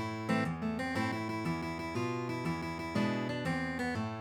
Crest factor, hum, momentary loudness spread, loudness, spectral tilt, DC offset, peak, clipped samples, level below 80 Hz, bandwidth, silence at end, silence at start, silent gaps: 16 dB; none; 3 LU; -35 LUFS; -6 dB/octave; under 0.1%; -18 dBFS; under 0.1%; -58 dBFS; 19 kHz; 0 s; 0 s; none